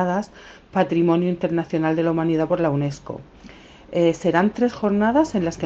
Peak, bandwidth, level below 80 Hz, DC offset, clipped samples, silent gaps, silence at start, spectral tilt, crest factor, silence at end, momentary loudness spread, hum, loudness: -4 dBFS; 7.8 kHz; -52 dBFS; under 0.1%; under 0.1%; none; 0 s; -7.5 dB/octave; 18 dB; 0 s; 9 LU; none; -21 LUFS